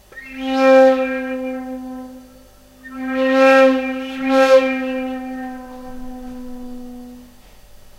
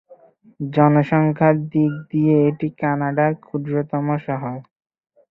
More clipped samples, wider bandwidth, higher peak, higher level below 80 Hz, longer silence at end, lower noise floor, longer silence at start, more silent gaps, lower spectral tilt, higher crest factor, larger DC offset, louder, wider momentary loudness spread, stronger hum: neither; first, 13 kHz vs 4.1 kHz; about the same, -2 dBFS vs -2 dBFS; first, -46 dBFS vs -60 dBFS; second, 0.25 s vs 0.7 s; second, -45 dBFS vs -49 dBFS; about the same, 0.15 s vs 0.1 s; neither; second, -4 dB/octave vs -11.5 dB/octave; about the same, 16 dB vs 18 dB; neither; first, -16 LUFS vs -19 LUFS; first, 23 LU vs 11 LU; first, 50 Hz at -55 dBFS vs none